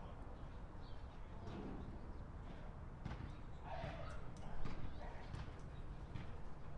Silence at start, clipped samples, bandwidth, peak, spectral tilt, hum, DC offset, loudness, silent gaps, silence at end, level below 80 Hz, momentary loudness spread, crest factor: 0 s; under 0.1%; 9.2 kHz; -30 dBFS; -7 dB/octave; none; under 0.1%; -53 LUFS; none; 0 s; -52 dBFS; 5 LU; 18 dB